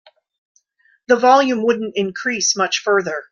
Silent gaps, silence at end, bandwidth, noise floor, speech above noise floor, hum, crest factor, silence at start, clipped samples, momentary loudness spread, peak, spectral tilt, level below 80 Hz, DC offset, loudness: none; 0.1 s; 7.4 kHz; -60 dBFS; 43 dB; none; 16 dB; 1.1 s; under 0.1%; 8 LU; -2 dBFS; -2.5 dB/octave; -66 dBFS; under 0.1%; -17 LUFS